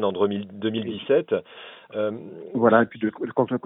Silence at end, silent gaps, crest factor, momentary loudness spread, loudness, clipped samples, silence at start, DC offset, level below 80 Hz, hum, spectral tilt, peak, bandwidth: 0.05 s; none; 22 dB; 15 LU; -24 LUFS; under 0.1%; 0 s; under 0.1%; -66 dBFS; none; -10.5 dB/octave; -2 dBFS; 3.9 kHz